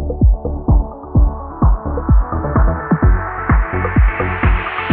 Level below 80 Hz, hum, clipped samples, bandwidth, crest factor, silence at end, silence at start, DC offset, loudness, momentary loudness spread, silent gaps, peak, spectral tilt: -16 dBFS; none; under 0.1%; 3.7 kHz; 12 dB; 0 s; 0 s; under 0.1%; -16 LUFS; 4 LU; none; -2 dBFS; -7.5 dB/octave